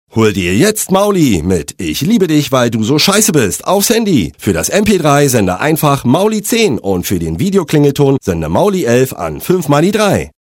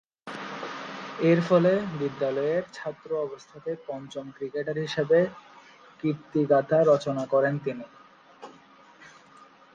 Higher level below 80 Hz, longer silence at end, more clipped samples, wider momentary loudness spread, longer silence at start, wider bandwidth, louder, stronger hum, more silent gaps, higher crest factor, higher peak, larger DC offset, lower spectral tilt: first, -36 dBFS vs -70 dBFS; about the same, 0.2 s vs 0.3 s; neither; second, 6 LU vs 17 LU; about the same, 0.15 s vs 0.25 s; first, 17 kHz vs 7.6 kHz; first, -12 LUFS vs -27 LUFS; neither; neither; second, 12 dB vs 18 dB; first, 0 dBFS vs -8 dBFS; neither; second, -5 dB/octave vs -7 dB/octave